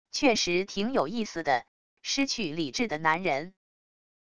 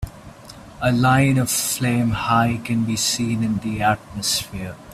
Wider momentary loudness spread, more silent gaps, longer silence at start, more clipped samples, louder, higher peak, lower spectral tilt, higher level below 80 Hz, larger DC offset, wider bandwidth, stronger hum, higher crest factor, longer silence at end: second, 6 LU vs 13 LU; first, 1.68-1.97 s vs none; about the same, 0.05 s vs 0 s; neither; second, -28 LUFS vs -20 LUFS; second, -10 dBFS vs -4 dBFS; about the same, -3.5 dB/octave vs -4.5 dB/octave; second, -60 dBFS vs -44 dBFS; first, 0.4% vs under 0.1%; second, 11 kHz vs 16 kHz; neither; about the same, 20 dB vs 18 dB; first, 0.7 s vs 0 s